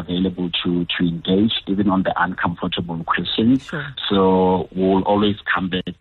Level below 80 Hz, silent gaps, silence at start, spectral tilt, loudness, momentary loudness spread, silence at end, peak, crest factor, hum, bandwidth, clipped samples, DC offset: -46 dBFS; none; 0 s; -8 dB/octave; -19 LUFS; 7 LU; 0.1 s; -6 dBFS; 14 dB; none; 4.7 kHz; under 0.1%; under 0.1%